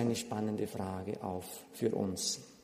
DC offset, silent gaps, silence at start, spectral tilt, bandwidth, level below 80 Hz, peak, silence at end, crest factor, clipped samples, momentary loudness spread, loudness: under 0.1%; none; 0 s; -4.5 dB/octave; 15.5 kHz; -70 dBFS; -18 dBFS; 0.05 s; 18 dB; under 0.1%; 6 LU; -37 LUFS